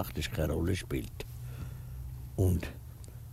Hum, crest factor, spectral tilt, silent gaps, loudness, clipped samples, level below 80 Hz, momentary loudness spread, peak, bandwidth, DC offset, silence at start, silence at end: none; 18 dB; -6 dB/octave; none; -35 LUFS; under 0.1%; -44 dBFS; 14 LU; -16 dBFS; 16 kHz; under 0.1%; 0 s; 0 s